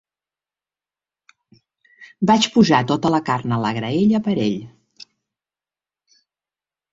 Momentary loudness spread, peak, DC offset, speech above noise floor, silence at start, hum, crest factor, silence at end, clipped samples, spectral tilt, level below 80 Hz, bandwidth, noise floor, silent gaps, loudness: 8 LU; -2 dBFS; under 0.1%; over 72 dB; 2 s; 50 Hz at -45 dBFS; 20 dB; 2.25 s; under 0.1%; -5.5 dB/octave; -58 dBFS; 7.8 kHz; under -90 dBFS; none; -18 LUFS